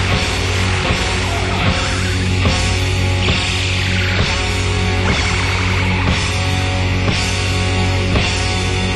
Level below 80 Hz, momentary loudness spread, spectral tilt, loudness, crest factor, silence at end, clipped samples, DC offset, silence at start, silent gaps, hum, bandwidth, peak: -24 dBFS; 2 LU; -4.5 dB/octave; -16 LUFS; 14 dB; 0 s; under 0.1%; under 0.1%; 0 s; none; none; 12 kHz; -2 dBFS